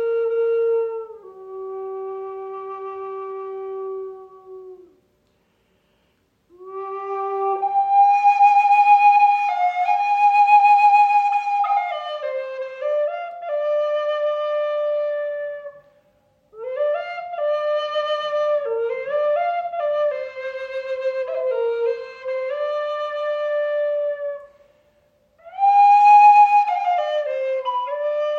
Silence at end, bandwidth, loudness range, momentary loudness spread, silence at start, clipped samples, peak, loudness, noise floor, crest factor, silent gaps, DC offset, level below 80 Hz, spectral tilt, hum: 0 s; 7 kHz; 16 LU; 18 LU; 0 s; under 0.1%; -4 dBFS; -19 LUFS; -65 dBFS; 16 dB; none; under 0.1%; -74 dBFS; -2.5 dB/octave; none